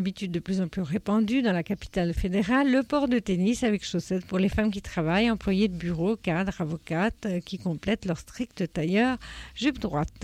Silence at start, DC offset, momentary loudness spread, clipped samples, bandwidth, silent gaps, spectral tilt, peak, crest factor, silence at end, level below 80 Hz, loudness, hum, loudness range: 0 s; under 0.1%; 8 LU; under 0.1%; 13.5 kHz; none; -6.5 dB/octave; -14 dBFS; 14 dB; 0 s; -44 dBFS; -27 LUFS; none; 4 LU